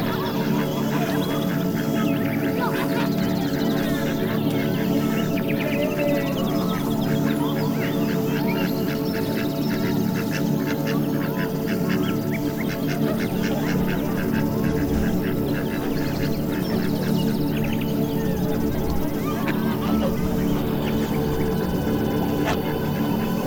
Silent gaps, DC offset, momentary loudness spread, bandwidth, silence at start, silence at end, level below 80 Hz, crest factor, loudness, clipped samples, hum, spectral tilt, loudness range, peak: none; under 0.1%; 2 LU; 19 kHz; 0 s; 0 s; -40 dBFS; 14 dB; -23 LUFS; under 0.1%; none; -6.5 dB/octave; 1 LU; -8 dBFS